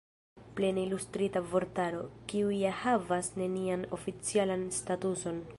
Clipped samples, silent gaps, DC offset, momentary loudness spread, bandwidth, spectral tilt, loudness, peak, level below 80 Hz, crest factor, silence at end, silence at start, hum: under 0.1%; none; under 0.1%; 6 LU; 11.5 kHz; -5 dB/octave; -33 LUFS; -16 dBFS; -62 dBFS; 18 dB; 0 s; 0.35 s; none